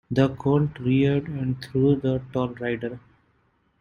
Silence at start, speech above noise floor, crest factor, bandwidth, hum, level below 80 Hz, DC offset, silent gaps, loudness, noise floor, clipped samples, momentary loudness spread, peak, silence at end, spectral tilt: 0.1 s; 43 dB; 18 dB; 7 kHz; none; -52 dBFS; under 0.1%; none; -24 LUFS; -66 dBFS; under 0.1%; 8 LU; -6 dBFS; 0.85 s; -9 dB/octave